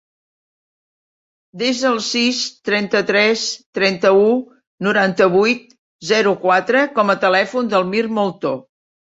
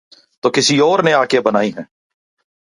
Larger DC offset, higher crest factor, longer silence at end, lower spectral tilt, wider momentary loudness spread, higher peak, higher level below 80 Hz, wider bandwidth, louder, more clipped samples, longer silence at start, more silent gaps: neither; about the same, 16 dB vs 16 dB; second, 0.5 s vs 0.75 s; about the same, -4 dB/octave vs -3.5 dB/octave; about the same, 8 LU vs 9 LU; about the same, -2 dBFS vs 0 dBFS; about the same, -64 dBFS vs -64 dBFS; second, 8 kHz vs 11.5 kHz; about the same, -16 LUFS vs -14 LUFS; neither; first, 1.55 s vs 0.45 s; first, 3.66-3.73 s, 4.67-4.78 s, 5.79-5.99 s vs none